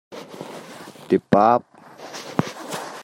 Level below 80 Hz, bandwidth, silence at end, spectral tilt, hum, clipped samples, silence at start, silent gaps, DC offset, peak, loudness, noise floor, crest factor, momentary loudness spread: -62 dBFS; 16.5 kHz; 0 s; -6 dB/octave; none; under 0.1%; 0.1 s; none; under 0.1%; -2 dBFS; -21 LUFS; -40 dBFS; 22 dB; 23 LU